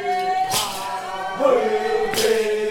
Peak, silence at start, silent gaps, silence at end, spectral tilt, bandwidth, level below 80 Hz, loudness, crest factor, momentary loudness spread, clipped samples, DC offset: -4 dBFS; 0 s; none; 0 s; -2 dB/octave; 19 kHz; -52 dBFS; -21 LUFS; 16 dB; 9 LU; under 0.1%; under 0.1%